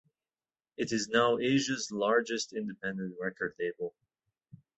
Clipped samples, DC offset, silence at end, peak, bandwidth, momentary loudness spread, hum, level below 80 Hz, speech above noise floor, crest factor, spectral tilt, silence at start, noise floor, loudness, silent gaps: under 0.1%; under 0.1%; 0.9 s; -12 dBFS; 8.4 kHz; 11 LU; none; -72 dBFS; over 59 dB; 22 dB; -4 dB/octave; 0.8 s; under -90 dBFS; -32 LUFS; none